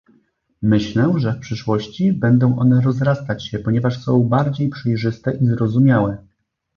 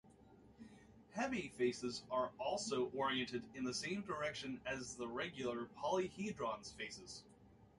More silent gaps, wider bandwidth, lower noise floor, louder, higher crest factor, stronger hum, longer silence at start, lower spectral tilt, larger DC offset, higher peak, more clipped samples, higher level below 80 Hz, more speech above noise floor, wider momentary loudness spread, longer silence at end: neither; second, 6.8 kHz vs 11.5 kHz; second, -60 dBFS vs -65 dBFS; first, -18 LUFS vs -43 LUFS; about the same, 14 dB vs 18 dB; neither; first, 0.6 s vs 0.05 s; first, -8.5 dB/octave vs -4 dB/octave; neither; first, -2 dBFS vs -26 dBFS; neither; first, -48 dBFS vs -72 dBFS; first, 43 dB vs 22 dB; second, 8 LU vs 12 LU; first, 0.6 s vs 0.1 s